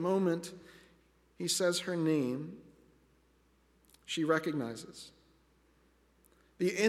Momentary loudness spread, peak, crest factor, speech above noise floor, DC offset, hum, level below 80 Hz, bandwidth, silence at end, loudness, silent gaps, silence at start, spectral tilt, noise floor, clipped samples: 21 LU; -16 dBFS; 20 dB; 36 dB; under 0.1%; none; -72 dBFS; 15.5 kHz; 0 s; -34 LUFS; none; 0 s; -4.5 dB/octave; -69 dBFS; under 0.1%